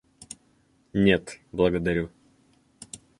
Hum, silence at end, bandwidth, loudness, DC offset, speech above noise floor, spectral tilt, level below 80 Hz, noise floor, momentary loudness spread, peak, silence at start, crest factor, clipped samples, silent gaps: none; 0.25 s; 11.5 kHz; -25 LUFS; under 0.1%; 40 dB; -6 dB/octave; -48 dBFS; -64 dBFS; 22 LU; -6 dBFS; 0.95 s; 22 dB; under 0.1%; none